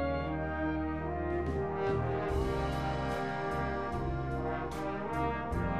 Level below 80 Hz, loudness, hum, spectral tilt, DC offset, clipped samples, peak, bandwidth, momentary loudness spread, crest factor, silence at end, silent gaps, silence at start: -42 dBFS; -34 LUFS; none; -7.5 dB/octave; 0.3%; under 0.1%; -20 dBFS; 13 kHz; 3 LU; 14 dB; 0 s; none; 0 s